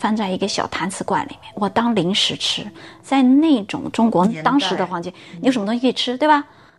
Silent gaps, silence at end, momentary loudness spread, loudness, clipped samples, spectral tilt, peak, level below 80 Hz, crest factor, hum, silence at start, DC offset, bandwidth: none; 0.35 s; 10 LU; -19 LUFS; under 0.1%; -4.5 dB/octave; -4 dBFS; -60 dBFS; 16 dB; none; 0 s; 0.1%; 12 kHz